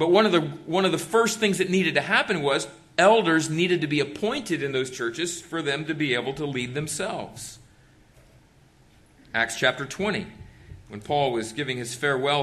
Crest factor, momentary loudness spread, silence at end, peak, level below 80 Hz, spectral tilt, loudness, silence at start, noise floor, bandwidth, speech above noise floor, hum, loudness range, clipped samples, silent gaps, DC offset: 20 dB; 9 LU; 0 s; -6 dBFS; -60 dBFS; -4 dB/octave; -24 LUFS; 0 s; -56 dBFS; 13 kHz; 32 dB; none; 8 LU; under 0.1%; none; under 0.1%